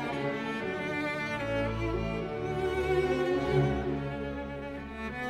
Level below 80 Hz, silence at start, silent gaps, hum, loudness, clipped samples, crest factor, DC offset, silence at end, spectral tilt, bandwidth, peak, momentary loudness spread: -44 dBFS; 0 s; none; none; -32 LUFS; under 0.1%; 16 dB; under 0.1%; 0 s; -7 dB/octave; 13.5 kHz; -14 dBFS; 10 LU